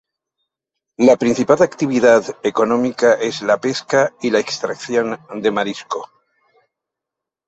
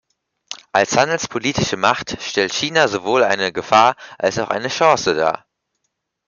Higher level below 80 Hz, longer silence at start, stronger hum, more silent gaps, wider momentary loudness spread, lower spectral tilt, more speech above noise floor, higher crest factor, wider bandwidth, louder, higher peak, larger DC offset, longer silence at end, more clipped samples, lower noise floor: second, -60 dBFS vs -54 dBFS; first, 1 s vs 0.5 s; neither; neither; about the same, 10 LU vs 8 LU; first, -4.5 dB/octave vs -3 dB/octave; first, 68 dB vs 57 dB; about the same, 16 dB vs 18 dB; first, 8.2 kHz vs 7.4 kHz; about the same, -17 LUFS vs -17 LUFS; about the same, -2 dBFS vs -2 dBFS; neither; first, 1.45 s vs 0.9 s; neither; first, -84 dBFS vs -74 dBFS